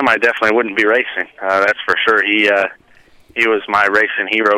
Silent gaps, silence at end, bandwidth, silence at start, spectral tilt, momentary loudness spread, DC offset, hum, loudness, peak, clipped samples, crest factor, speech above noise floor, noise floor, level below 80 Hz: none; 0 s; 14.5 kHz; 0 s; -3.5 dB/octave; 6 LU; under 0.1%; none; -14 LUFS; -2 dBFS; under 0.1%; 12 dB; 32 dB; -47 dBFS; -58 dBFS